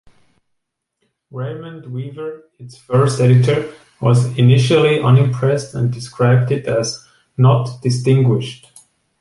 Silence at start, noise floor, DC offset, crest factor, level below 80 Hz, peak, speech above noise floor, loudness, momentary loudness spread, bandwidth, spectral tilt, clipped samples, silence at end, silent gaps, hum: 1.35 s; -74 dBFS; under 0.1%; 14 dB; -52 dBFS; -2 dBFS; 59 dB; -15 LUFS; 17 LU; 11.5 kHz; -7 dB/octave; under 0.1%; 0.65 s; none; none